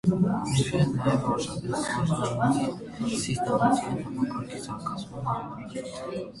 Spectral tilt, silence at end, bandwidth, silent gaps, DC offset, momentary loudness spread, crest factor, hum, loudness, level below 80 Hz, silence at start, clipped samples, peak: -6 dB/octave; 0 s; 11.5 kHz; none; under 0.1%; 11 LU; 18 dB; none; -28 LUFS; -52 dBFS; 0.05 s; under 0.1%; -10 dBFS